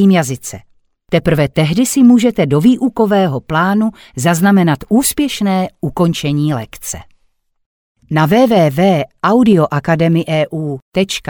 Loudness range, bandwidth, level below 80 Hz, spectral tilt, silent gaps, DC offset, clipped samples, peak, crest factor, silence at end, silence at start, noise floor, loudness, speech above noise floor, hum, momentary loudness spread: 4 LU; over 20 kHz; -42 dBFS; -6 dB/octave; 7.66-7.95 s, 10.82-10.92 s; under 0.1%; under 0.1%; 0 dBFS; 12 dB; 0 s; 0 s; -60 dBFS; -13 LUFS; 47 dB; none; 10 LU